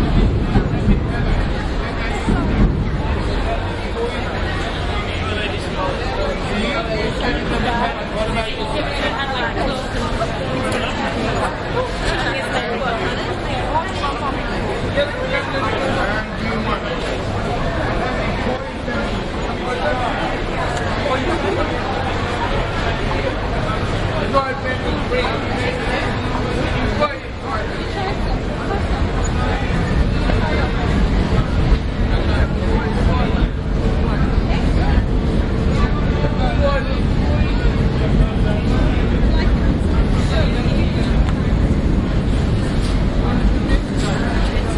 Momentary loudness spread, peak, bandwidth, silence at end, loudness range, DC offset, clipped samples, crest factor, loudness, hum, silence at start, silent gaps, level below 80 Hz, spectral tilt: 4 LU; -2 dBFS; 11.5 kHz; 0 s; 3 LU; under 0.1%; under 0.1%; 16 dB; -19 LUFS; none; 0 s; none; -22 dBFS; -6.5 dB/octave